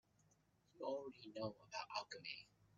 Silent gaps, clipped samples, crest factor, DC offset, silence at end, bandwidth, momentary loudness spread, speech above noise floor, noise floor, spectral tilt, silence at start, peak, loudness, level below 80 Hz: none; under 0.1%; 22 dB; under 0.1%; 0.1 s; 7.4 kHz; 5 LU; 27 dB; -78 dBFS; -2.5 dB/octave; 0.75 s; -30 dBFS; -50 LUFS; -86 dBFS